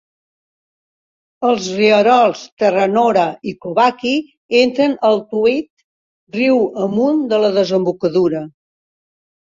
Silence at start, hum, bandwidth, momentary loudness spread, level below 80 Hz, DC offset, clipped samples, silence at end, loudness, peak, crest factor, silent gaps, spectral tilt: 1.4 s; none; 7.6 kHz; 8 LU; -60 dBFS; under 0.1%; under 0.1%; 0.95 s; -15 LUFS; -2 dBFS; 16 dB; 2.52-2.57 s, 4.37-4.49 s, 5.70-5.77 s, 5.84-6.27 s; -5.5 dB/octave